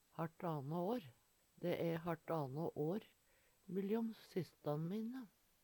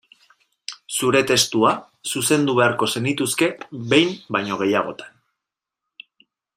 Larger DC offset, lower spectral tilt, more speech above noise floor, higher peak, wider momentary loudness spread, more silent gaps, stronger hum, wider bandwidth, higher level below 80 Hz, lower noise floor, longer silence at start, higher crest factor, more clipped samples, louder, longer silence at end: neither; first, -8 dB/octave vs -3.5 dB/octave; second, 31 dB vs 65 dB; second, -28 dBFS vs -2 dBFS; second, 7 LU vs 15 LU; neither; neither; first, 19 kHz vs 15.5 kHz; second, -82 dBFS vs -64 dBFS; second, -75 dBFS vs -85 dBFS; second, 0.15 s vs 0.7 s; about the same, 16 dB vs 20 dB; neither; second, -44 LUFS vs -20 LUFS; second, 0.35 s vs 1.5 s